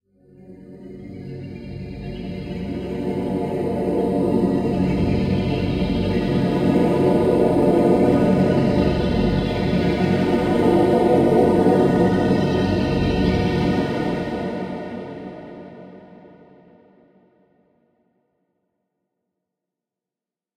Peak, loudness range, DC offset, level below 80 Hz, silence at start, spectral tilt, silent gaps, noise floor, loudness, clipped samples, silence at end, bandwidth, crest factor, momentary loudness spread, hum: -4 dBFS; 12 LU; under 0.1%; -38 dBFS; 0.45 s; -8 dB/octave; none; -89 dBFS; -19 LUFS; under 0.1%; 4.3 s; 14 kHz; 18 dB; 18 LU; none